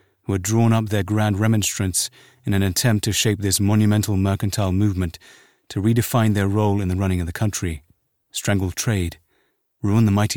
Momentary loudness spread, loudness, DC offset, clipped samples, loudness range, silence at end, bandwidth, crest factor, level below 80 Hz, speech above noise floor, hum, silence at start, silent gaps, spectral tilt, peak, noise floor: 9 LU; -21 LUFS; 0.3%; under 0.1%; 4 LU; 0 s; 18.5 kHz; 16 dB; -44 dBFS; 47 dB; none; 0.3 s; none; -5 dB/octave; -4 dBFS; -67 dBFS